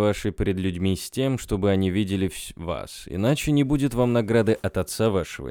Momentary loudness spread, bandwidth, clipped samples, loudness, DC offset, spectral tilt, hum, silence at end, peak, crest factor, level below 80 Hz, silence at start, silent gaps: 10 LU; 19.5 kHz; under 0.1%; -24 LUFS; under 0.1%; -6 dB/octave; none; 0 s; -8 dBFS; 16 dB; -42 dBFS; 0 s; none